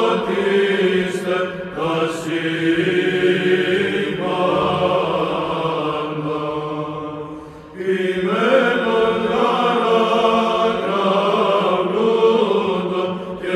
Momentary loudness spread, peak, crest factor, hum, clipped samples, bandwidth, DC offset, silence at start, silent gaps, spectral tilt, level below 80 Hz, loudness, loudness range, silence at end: 9 LU; -4 dBFS; 14 dB; none; under 0.1%; 13 kHz; under 0.1%; 0 s; none; -6 dB/octave; -54 dBFS; -18 LUFS; 5 LU; 0 s